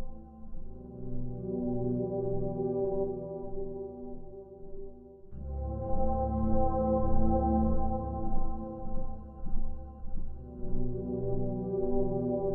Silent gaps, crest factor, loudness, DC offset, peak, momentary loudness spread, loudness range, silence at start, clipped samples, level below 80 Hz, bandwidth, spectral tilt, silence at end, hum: none; 16 dB; -34 LUFS; under 0.1%; -14 dBFS; 18 LU; 8 LU; 0 s; under 0.1%; -34 dBFS; 1.7 kHz; -14.5 dB/octave; 0 s; none